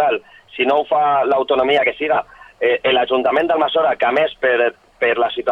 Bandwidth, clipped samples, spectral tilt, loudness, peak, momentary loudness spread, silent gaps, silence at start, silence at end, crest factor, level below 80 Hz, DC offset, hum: 5.8 kHz; under 0.1%; -5.5 dB/octave; -17 LUFS; -4 dBFS; 5 LU; none; 0 s; 0 s; 12 dB; -56 dBFS; under 0.1%; none